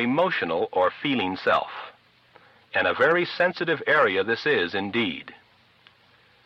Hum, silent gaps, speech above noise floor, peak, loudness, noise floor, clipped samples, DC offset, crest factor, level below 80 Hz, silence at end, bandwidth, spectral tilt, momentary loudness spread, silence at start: none; none; 35 dB; -8 dBFS; -23 LUFS; -58 dBFS; under 0.1%; under 0.1%; 16 dB; -66 dBFS; 1.1 s; 7.6 kHz; -6 dB/octave; 11 LU; 0 s